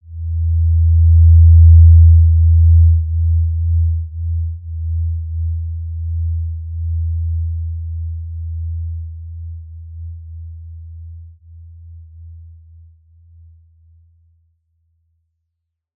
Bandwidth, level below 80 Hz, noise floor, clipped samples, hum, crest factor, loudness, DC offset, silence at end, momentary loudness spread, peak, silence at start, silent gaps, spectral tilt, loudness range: 0.1 kHz; -22 dBFS; -76 dBFS; under 0.1%; none; 14 dB; -14 LUFS; under 0.1%; 3.55 s; 25 LU; -2 dBFS; 0.1 s; none; -18 dB/octave; 24 LU